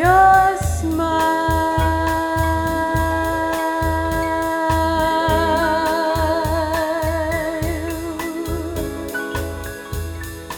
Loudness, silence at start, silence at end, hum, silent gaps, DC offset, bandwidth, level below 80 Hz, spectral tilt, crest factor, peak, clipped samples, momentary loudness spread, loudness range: -19 LUFS; 0 s; 0 s; none; none; under 0.1%; over 20 kHz; -30 dBFS; -5.5 dB/octave; 18 dB; -2 dBFS; under 0.1%; 9 LU; 5 LU